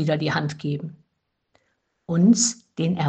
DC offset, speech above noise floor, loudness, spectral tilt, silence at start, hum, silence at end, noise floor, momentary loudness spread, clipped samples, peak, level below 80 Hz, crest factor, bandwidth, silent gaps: under 0.1%; 54 dB; -22 LUFS; -5 dB/octave; 0 s; none; 0 s; -75 dBFS; 13 LU; under 0.1%; -6 dBFS; -66 dBFS; 18 dB; 9.4 kHz; none